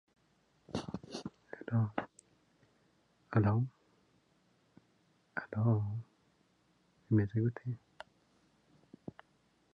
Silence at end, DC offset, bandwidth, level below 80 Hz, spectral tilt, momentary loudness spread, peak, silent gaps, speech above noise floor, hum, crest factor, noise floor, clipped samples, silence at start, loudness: 1.95 s; under 0.1%; 8.6 kHz; -64 dBFS; -8.5 dB/octave; 21 LU; -16 dBFS; none; 41 dB; none; 22 dB; -73 dBFS; under 0.1%; 0.7 s; -36 LUFS